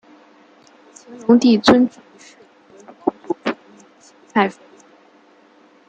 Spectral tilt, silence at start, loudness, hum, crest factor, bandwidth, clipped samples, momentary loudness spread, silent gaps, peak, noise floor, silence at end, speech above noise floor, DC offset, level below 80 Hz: -5 dB/octave; 1.1 s; -17 LUFS; none; 20 dB; 8.6 kHz; under 0.1%; 13 LU; none; -2 dBFS; -51 dBFS; 1.4 s; 36 dB; under 0.1%; -60 dBFS